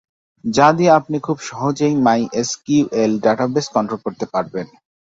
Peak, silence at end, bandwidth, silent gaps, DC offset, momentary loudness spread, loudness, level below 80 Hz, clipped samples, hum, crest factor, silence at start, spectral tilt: 0 dBFS; 0.4 s; 7.8 kHz; none; under 0.1%; 11 LU; -17 LUFS; -56 dBFS; under 0.1%; none; 16 dB; 0.45 s; -5.5 dB/octave